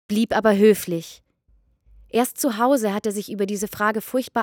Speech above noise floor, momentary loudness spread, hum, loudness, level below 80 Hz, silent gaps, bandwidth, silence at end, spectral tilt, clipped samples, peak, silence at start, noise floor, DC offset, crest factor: 40 dB; 10 LU; none; -21 LUFS; -58 dBFS; none; 20 kHz; 0 s; -5 dB/octave; under 0.1%; -4 dBFS; 0.1 s; -61 dBFS; under 0.1%; 18 dB